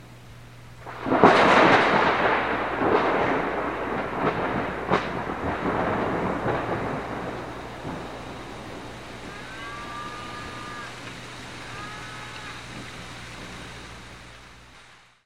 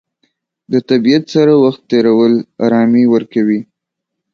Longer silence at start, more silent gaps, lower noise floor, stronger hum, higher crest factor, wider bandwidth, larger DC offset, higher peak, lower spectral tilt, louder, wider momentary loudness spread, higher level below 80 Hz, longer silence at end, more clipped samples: second, 0 s vs 0.7 s; neither; second, -52 dBFS vs -77 dBFS; neither; first, 26 dB vs 12 dB; first, 15 kHz vs 7 kHz; first, 0.3% vs under 0.1%; about the same, 0 dBFS vs 0 dBFS; second, -5.5 dB/octave vs -7.5 dB/octave; second, -24 LUFS vs -12 LUFS; first, 21 LU vs 6 LU; first, -50 dBFS vs -58 dBFS; second, 0.3 s vs 0.7 s; neither